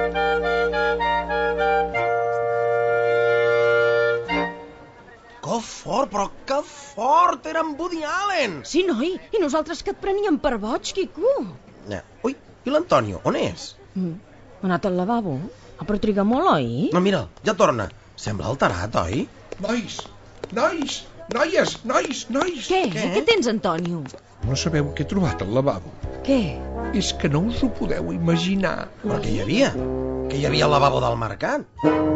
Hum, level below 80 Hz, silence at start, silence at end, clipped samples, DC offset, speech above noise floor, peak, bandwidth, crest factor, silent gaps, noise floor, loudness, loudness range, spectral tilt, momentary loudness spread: none; -42 dBFS; 0 s; 0 s; under 0.1%; under 0.1%; 24 dB; -2 dBFS; 8.4 kHz; 20 dB; none; -46 dBFS; -22 LUFS; 4 LU; -5.5 dB/octave; 12 LU